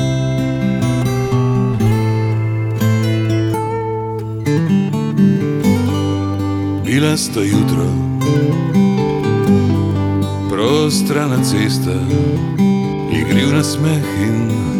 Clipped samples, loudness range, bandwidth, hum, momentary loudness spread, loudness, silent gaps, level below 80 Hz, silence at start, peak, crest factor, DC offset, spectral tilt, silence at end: under 0.1%; 2 LU; 17.5 kHz; none; 5 LU; -16 LUFS; none; -40 dBFS; 0 s; -2 dBFS; 12 dB; under 0.1%; -6.5 dB/octave; 0 s